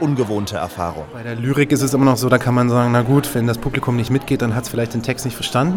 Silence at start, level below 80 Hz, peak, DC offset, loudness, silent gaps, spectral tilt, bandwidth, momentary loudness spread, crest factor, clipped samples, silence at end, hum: 0 s; -42 dBFS; 0 dBFS; under 0.1%; -18 LUFS; none; -6 dB/octave; 18 kHz; 9 LU; 16 dB; under 0.1%; 0 s; none